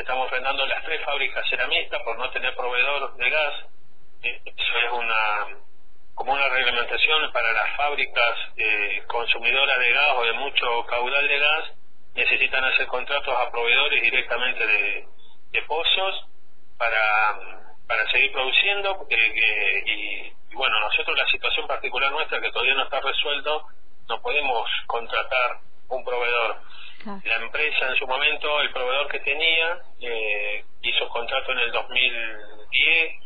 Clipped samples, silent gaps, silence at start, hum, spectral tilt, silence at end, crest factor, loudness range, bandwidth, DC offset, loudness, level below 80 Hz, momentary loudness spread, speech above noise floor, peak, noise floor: under 0.1%; none; 0 s; none; -4 dB/octave; 0.1 s; 20 dB; 4 LU; 5 kHz; 4%; -22 LUFS; -52 dBFS; 10 LU; 35 dB; -4 dBFS; -59 dBFS